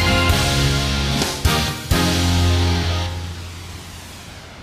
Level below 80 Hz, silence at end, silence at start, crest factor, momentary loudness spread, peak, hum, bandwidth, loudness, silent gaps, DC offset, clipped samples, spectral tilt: -28 dBFS; 0 s; 0 s; 16 dB; 18 LU; -4 dBFS; none; 15.5 kHz; -18 LUFS; none; under 0.1%; under 0.1%; -4 dB/octave